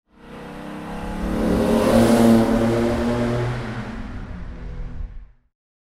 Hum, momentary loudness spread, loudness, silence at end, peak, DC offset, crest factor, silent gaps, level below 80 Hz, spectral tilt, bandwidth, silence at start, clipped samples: none; 21 LU; -19 LUFS; 0.75 s; -4 dBFS; under 0.1%; 18 dB; none; -34 dBFS; -6.5 dB/octave; 15.5 kHz; 0.25 s; under 0.1%